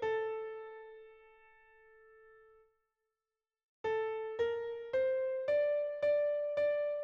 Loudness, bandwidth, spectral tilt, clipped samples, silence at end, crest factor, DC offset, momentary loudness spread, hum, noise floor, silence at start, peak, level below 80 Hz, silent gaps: -35 LUFS; 6.6 kHz; -4.5 dB/octave; under 0.1%; 0 s; 14 dB; under 0.1%; 15 LU; none; under -90 dBFS; 0 s; -24 dBFS; -76 dBFS; 3.63-3.84 s